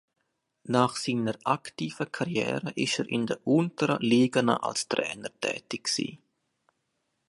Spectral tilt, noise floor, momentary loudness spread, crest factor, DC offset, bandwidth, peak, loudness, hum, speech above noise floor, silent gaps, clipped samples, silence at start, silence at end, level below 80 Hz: -4.5 dB/octave; -78 dBFS; 9 LU; 22 dB; under 0.1%; 11.5 kHz; -6 dBFS; -28 LUFS; none; 50 dB; none; under 0.1%; 0.65 s; 1.1 s; -70 dBFS